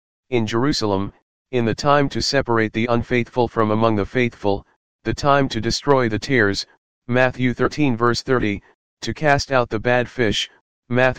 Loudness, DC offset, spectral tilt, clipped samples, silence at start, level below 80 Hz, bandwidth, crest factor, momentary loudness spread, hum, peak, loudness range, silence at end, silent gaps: -20 LUFS; 2%; -5.5 dB/octave; under 0.1%; 0.2 s; -42 dBFS; 15 kHz; 20 dB; 8 LU; none; 0 dBFS; 1 LU; 0 s; 1.22-1.45 s, 4.76-4.99 s, 6.78-7.02 s, 8.75-8.97 s, 10.61-10.83 s